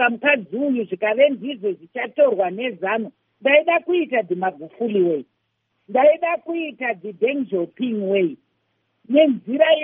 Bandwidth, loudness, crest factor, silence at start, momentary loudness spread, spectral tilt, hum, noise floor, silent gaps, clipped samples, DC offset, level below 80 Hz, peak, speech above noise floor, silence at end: 3.7 kHz; -20 LUFS; 18 dB; 0 s; 10 LU; -3 dB/octave; none; -72 dBFS; none; under 0.1%; under 0.1%; -80 dBFS; -2 dBFS; 52 dB; 0 s